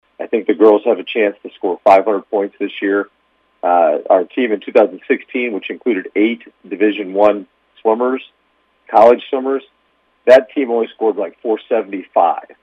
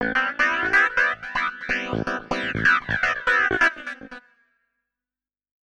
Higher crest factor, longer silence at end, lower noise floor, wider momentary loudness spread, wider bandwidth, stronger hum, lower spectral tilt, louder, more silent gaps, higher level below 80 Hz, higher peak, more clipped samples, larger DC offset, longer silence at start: about the same, 16 dB vs 16 dB; second, 0.15 s vs 1.55 s; second, -60 dBFS vs under -90 dBFS; about the same, 11 LU vs 9 LU; second, 7.6 kHz vs 10.5 kHz; second, none vs 50 Hz at -65 dBFS; first, -6 dB/octave vs -4 dB/octave; first, -15 LUFS vs -21 LUFS; neither; second, -62 dBFS vs -48 dBFS; first, 0 dBFS vs -8 dBFS; neither; neither; first, 0.2 s vs 0 s